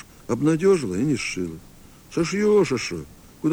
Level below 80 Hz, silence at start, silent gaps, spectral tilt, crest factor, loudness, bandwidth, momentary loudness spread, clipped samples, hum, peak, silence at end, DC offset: -50 dBFS; 0.3 s; none; -5.5 dB/octave; 14 dB; -23 LUFS; 20 kHz; 13 LU; under 0.1%; none; -8 dBFS; 0 s; under 0.1%